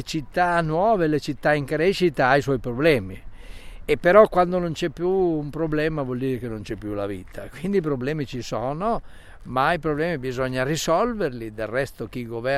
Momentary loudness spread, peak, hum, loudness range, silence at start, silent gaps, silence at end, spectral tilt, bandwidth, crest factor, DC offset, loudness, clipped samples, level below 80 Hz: 12 LU; -2 dBFS; none; 6 LU; 0 s; none; 0 s; -6 dB/octave; 15 kHz; 22 dB; under 0.1%; -23 LUFS; under 0.1%; -42 dBFS